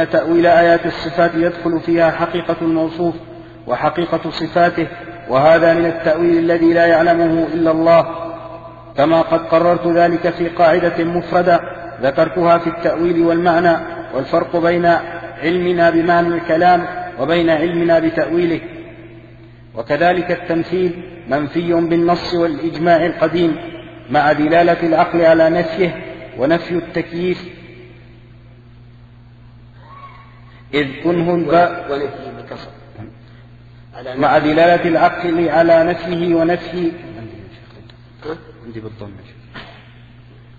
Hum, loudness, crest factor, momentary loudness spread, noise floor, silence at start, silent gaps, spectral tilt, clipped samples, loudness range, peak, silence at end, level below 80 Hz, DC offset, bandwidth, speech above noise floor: 60 Hz at -40 dBFS; -15 LUFS; 16 dB; 19 LU; -41 dBFS; 0 s; none; -8 dB/octave; under 0.1%; 8 LU; 0 dBFS; 0.85 s; -46 dBFS; under 0.1%; 7 kHz; 27 dB